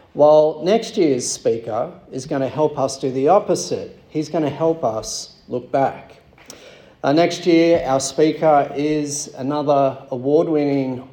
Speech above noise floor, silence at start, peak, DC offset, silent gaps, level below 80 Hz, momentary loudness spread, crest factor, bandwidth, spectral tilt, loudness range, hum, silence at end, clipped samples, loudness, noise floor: 26 dB; 0.15 s; -2 dBFS; under 0.1%; none; -56 dBFS; 11 LU; 16 dB; 17.5 kHz; -5 dB/octave; 5 LU; none; 0.05 s; under 0.1%; -19 LUFS; -44 dBFS